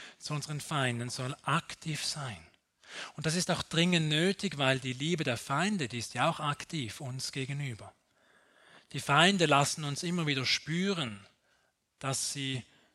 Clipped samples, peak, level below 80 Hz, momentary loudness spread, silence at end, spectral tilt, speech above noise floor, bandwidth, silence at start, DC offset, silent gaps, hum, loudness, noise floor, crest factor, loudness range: under 0.1%; -10 dBFS; -68 dBFS; 13 LU; 0.3 s; -4 dB/octave; 42 dB; 13.5 kHz; 0 s; under 0.1%; none; none; -31 LUFS; -73 dBFS; 22 dB; 6 LU